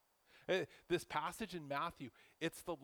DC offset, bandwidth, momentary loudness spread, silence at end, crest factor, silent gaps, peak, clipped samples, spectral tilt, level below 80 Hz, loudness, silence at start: under 0.1%; over 20 kHz; 12 LU; 0 s; 18 dB; none; -24 dBFS; under 0.1%; -4.5 dB/octave; -72 dBFS; -42 LUFS; 0.35 s